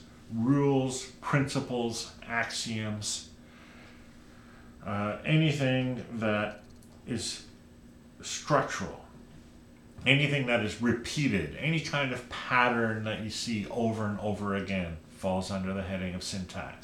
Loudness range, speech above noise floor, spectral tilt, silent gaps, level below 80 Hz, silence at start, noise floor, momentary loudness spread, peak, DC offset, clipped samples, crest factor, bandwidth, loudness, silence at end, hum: 6 LU; 23 dB; -5 dB/octave; none; -56 dBFS; 0 s; -53 dBFS; 12 LU; -4 dBFS; under 0.1%; under 0.1%; 26 dB; 16 kHz; -30 LUFS; 0 s; none